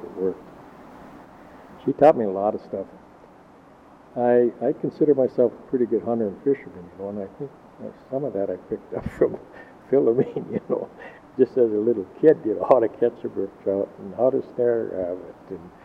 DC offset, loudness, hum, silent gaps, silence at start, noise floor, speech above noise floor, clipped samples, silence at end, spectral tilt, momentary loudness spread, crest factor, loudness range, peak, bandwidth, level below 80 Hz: under 0.1%; -23 LUFS; none; none; 0 s; -50 dBFS; 27 dB; under 0.1%; 0.15 s; -9.5 dB/octave; 19 LU; 22 dB; 6 LU; -2 dBFS; 5.6 kHz; -58 dBFS